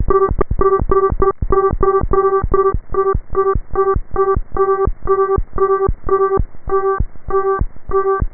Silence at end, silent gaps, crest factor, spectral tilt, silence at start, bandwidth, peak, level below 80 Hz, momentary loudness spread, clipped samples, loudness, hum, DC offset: 0 s; none; 14 dB; -13.5 dB/octave; 0 s; 2.3 kHz; 0 dBFS; -24 dBFS; 4 LU; under 0.1%; -17 LUFS; none; 0.7%